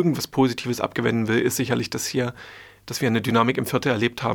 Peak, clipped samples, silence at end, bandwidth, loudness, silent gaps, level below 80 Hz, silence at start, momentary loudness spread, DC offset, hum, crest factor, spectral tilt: -4 dBFS; under 0.1%; 0 s; over 20 kHz; -23 LUFS; none; -58 dBFS; 0 s; 10 LU; under 0.1%; none; 20 dB; -5 dB/octave